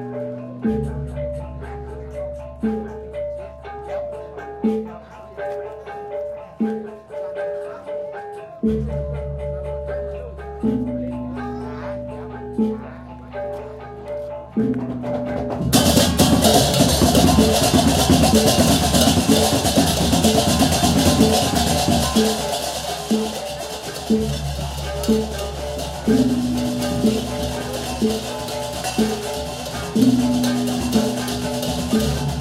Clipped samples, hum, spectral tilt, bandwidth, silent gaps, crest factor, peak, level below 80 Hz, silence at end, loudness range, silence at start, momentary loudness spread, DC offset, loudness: under 0.1%; none; -4.5 dB/octave; 16 kHz; none; 20 dB; 0 dBFS; -34 dBFS; 0 s; 13 LU; 0 s; 16 LU; under 0.1%; -20 LUFS